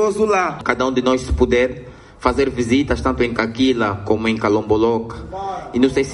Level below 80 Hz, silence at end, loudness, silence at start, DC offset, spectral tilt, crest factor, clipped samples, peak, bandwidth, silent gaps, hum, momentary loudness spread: -34 dBFS; 0 s; -18 LUFS; 0 s; under 0.1%; -5.5 dB/octave; 16 dB; under 0.1%; -2 dBFS; 11.5 kHz; none; none; 7 LU